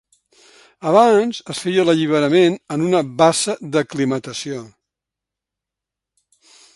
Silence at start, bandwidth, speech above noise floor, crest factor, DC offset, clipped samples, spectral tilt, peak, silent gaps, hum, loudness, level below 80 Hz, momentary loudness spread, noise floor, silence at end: 0.8 s; 11.5 kHz; 69 dB; 18 dB; under 0.1%; under 0.1%; -5 dB/octave; 0 dBFS; none; none; -17 LUFS; -64 dBFS; 13 LU; -85 dBFS; 2.05 s